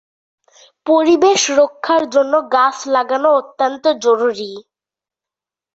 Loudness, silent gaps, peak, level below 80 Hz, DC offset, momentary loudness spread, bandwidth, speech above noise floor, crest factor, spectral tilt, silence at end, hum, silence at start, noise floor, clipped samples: -14 LUFS; none; -2 dBFS; -64 dBFS; under 0.1%; 8 LU; 8 kHz; 75 dB; 14 dB; -2 dB/octave; 1.15 s; none; 0.85 s; -89 dBFS; under 0.1%